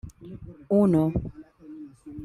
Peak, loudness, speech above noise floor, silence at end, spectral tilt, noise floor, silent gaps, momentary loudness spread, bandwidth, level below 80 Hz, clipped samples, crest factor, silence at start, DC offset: -10 dBFS; -23 LUFS; 20 dB; 0 s; -10.5 dB/octave; -44 dBFS; none; 23 LU; 12 kHz; -48 dBFS; under 0.1%; 16 dB; 0.05 s; under 0.1%